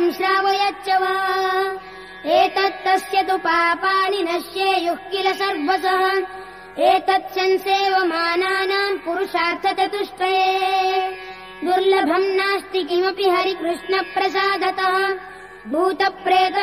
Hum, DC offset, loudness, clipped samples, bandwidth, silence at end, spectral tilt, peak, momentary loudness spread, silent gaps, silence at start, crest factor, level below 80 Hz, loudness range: none; 0.1%; -19 LUFS; under 0.1%; 15.5 kHz; 0 s; -3 dB/octave; -6 dBFS; 6 LU; none; 0 s; 14 dB; -60 dBFS; 1 LU